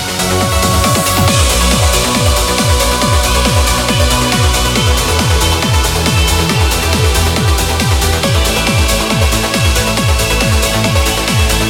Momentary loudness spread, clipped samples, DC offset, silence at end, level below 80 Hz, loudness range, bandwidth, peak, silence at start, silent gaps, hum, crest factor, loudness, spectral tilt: 2 LU; under 0.1%; under 0.1%; 0 s; -16 dBFS; 1 LU; 18.5 kHz; 0 dBFS; 0 s; none; none; 12 dB; -11 LUFS; -3.5 dB/octave